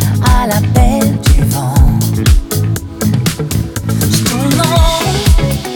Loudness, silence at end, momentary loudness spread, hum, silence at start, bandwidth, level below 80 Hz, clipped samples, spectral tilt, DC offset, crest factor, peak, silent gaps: -12 LUFS; 0 s; 5 LU; none; 0 s; over 20 kHz; -16 dBFS; under 0.1%; -5 dB/octave; under 0.1%; 10 dB; 0 dBFS; none